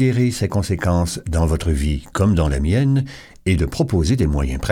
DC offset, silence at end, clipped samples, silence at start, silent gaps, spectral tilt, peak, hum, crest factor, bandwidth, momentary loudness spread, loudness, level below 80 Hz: under 0.1%; 0 s; under 0.1%; 0 s; none; -6.5 dB/octave; -4 dBFS; none; 14 dB; 16 kHz; 5 LU; -19 LUFS; -26 dBFS